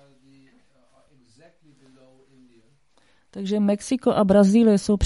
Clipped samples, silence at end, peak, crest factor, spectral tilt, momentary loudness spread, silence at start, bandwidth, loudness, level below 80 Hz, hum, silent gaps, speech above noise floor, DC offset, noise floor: under 0.1%; 0 s; -4 dBFS; 18 dB; -7 dB/octave; 14 LU; 3.35 s; 11.5 kHz; -19 LUFS; -56 dBFS; none; none; 45 dB; under 0.1%; -63 dBFS